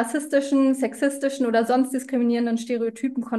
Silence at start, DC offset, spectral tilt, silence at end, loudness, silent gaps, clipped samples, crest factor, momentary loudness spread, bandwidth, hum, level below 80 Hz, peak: 0 s; under 0.1%; -4.5 dB/octave; 0 s; -23 LUFS; none; under 0.1%; 14 dB; 5 LU; 12.5 kHz; none; -72 dBFS; -8 dBFS